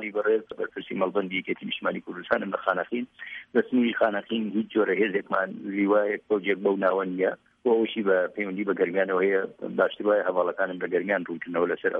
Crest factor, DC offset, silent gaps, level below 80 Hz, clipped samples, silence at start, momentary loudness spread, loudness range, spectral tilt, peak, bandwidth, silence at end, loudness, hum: 18 dB; under 0.1%; none; -72 dBFS; under 0.1%; 0 s; 7 LU; 3 LU; -8.5 dB/octave; -8 dBFS; 4.6 kHz; 0 s; -26 LUFS; none